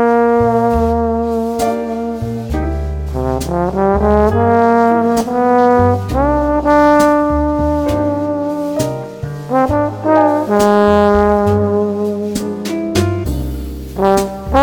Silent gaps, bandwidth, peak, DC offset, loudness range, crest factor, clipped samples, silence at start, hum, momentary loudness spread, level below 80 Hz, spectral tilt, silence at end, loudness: none; 19.5 kHz; 0 dBFS; under 0.1%; 5 LU; 14 dB; 0.1%; 0 s; none; 10 LU; -26 dBFS; -7 dB/octave; 0 s; -14 LUFS